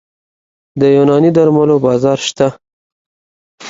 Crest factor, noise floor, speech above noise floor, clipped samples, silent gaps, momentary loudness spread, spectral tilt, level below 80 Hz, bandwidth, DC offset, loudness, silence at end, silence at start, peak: 14 dB; under -90 dBFS; over 80 dB; under 0.1%; 2.73-3.58 s; 7 LU; -6.5 dB/octave; -52 dBFS; 7.8 kHz; under 0.1%; -11 LUFS; 0 s; 0.75 s; 0 dBFS